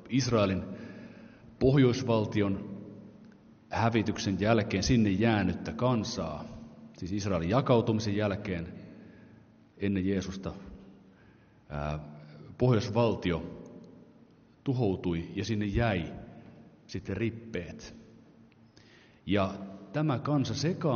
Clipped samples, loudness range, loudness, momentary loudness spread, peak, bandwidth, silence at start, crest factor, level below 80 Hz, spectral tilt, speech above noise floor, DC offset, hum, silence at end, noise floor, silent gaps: under 0.1%; 8 LU; -30 LUFS; 21 LU; -10 dBFS; 6.8 kHz; 0 s; 22 dB; -52 dBFS; -6 dB/octave; 30 dB; under 0.1%; none; 0 s; -59 dBFS; none